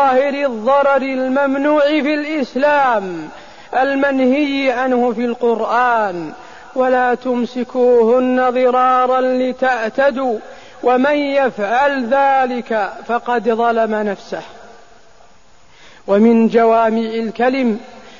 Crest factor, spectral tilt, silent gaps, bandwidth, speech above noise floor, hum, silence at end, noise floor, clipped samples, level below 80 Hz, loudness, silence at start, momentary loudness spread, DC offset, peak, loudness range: 14 dB; -6 dB/octave; none; 7.4 kHz; 35 dB; none; 0.2 s; -49 dBFS; under 0.1%; -58 dBFS; -15 LUFS; 0 s; 9 LU; 0.7%; -2 dBFS; 3 LU